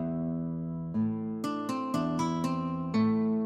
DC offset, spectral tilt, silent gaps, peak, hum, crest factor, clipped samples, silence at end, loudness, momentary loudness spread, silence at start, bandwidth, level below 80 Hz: under 0.1%; -7.5 dB/octave; none; -18 dBFS; none; 12 dB; under 0.1%; 0 s; -31 LUFS; 7 LU; 0 s; 13.5 kHz; -60 dBFS